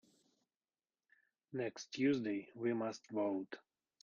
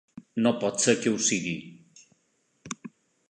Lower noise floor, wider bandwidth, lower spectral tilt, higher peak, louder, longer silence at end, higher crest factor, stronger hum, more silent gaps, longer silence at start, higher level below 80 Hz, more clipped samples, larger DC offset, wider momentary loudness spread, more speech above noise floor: first, under -90 dBFS vs -71 dBFS; second, 7.4 kHz vs 11 kHz; first, -5.5 dB/octave vs -3 dB/octave; second, -24 dBFS vs -6 dBFS; second, -40 LUFS vs -26 LUFS; about the same, 0.45 s vs 0.4 s; about the same, 18 dB vs 22 dB; neither; neither; first, 1.5 s vs 0.15 s; second, -86 dBFS vs -70 dBFS; neither; neither; second, 11 LU vs 17 LU; first, over 51 dB vs 46 dB